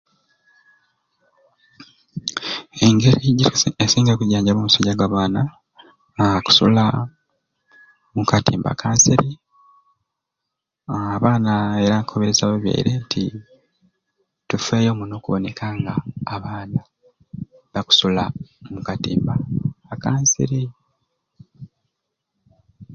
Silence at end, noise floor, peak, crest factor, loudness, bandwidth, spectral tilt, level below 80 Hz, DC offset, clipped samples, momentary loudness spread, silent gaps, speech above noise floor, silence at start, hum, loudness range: 0 s; -81 dBFS; 0 dBFS; 20 dB; -19 LUFS; 7.6 kHz; -4.5 dB/octave; -48 dBFS; under 0.1%; under 0.1%; 15 LU; none; 63 dB; 1.8 s; none; 7 LU